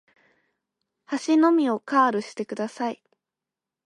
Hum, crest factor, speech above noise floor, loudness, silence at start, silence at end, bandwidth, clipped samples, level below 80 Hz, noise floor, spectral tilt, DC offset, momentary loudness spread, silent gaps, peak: none; 18 dB; 66 dB; -24 LUFS; 1.1 s; 0.95 s; 11 kHz; under 0.1%; -80 dBFS; -88 dBFS; -5 dB/octave; under 0.1%; 13 LU; none; -6 dBFS